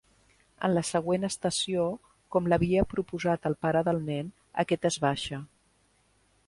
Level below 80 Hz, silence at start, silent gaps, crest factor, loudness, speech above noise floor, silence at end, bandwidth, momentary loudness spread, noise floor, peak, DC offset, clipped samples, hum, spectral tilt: -52 dBFS; 0.6 s; none; 18 dB; -29 LUFS; 39 dB; 1 s; 11.5 kHz; 8 LU; -67 dBFS; -12 dBFS; under 0.1%; under 0.1%; none; -5 dB/octave